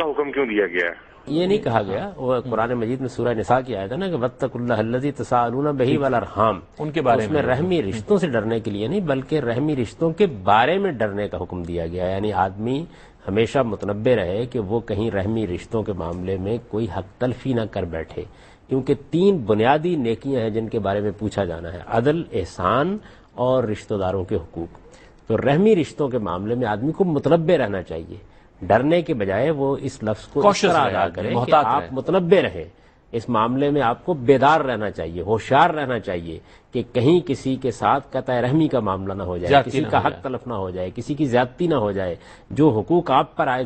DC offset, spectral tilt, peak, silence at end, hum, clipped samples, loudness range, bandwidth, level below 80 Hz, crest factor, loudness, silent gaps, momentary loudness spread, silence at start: under 0.1%; -7 dB/octave; -2 dBFS; 0 s; none; under 0.1%; 4 LU; 8.8 kHz; -48 dBFS; 20 dB; -21 LUFS; none; 11 LU; 0 s